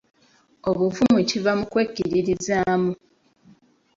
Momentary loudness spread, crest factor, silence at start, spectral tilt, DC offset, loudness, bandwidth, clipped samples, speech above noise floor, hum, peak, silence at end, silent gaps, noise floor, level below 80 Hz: 8 LU; 16 dB; 0.65 s; -5.5 dB/octave; under 0.1%; -22 LUFS; 7.8 kHz; under 0.1%; 36 dB; none; -6 dBFS; 1 s; none; -58 dBFS; -54 dBFS